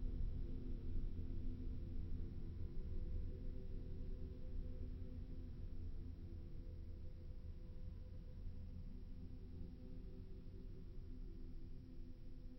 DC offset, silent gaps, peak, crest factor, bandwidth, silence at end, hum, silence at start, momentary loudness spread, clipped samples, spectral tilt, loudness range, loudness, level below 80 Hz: under 0.1%; none; -32 dBFS; 14 dB; 5.6 kHz; 0 s; none; 0 s; 7 LU; under 0.1%; -9.5 dB/octave; 6 LU; -54 LUFS; -48 dBFS